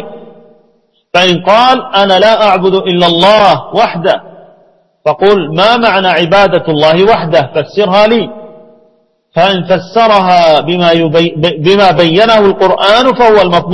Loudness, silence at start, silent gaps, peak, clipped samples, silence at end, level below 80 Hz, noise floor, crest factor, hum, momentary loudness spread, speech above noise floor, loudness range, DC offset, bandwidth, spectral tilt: -8 LUFS; 0 s; none; 0 dBFS; 1%; 0 s; -42 dBFS; -53 dBFS; 8 dB; none; 6 LU; 45 dB; 3 LU; under 0.1%; 11 kHz; -5.5 dB/octave